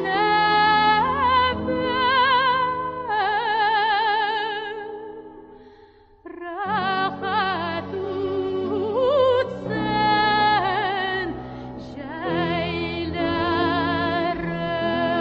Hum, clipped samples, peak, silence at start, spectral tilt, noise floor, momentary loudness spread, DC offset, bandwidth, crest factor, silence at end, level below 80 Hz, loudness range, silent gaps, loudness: none; under 0.1%; -6 dBFS; 0 s; -7 dB/octave; -51 dBFS; 14 LU; under 0.1%; 6.2 kHz; 16 dB; 0 s; -46 dBFS; 7 LU; none; -22 LUFS